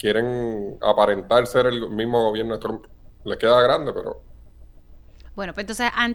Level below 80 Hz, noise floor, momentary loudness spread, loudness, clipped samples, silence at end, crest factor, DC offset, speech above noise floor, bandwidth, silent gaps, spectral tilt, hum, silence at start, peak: -46 dBFS; -46 dBFS; 16 LU; -21 LUFS; under 0.1%; 0 s; 20 dB; under 0.1%; 25 dB; 19 kHz; none; -5 dB/octave; none; 0.05 s; -2 dBFS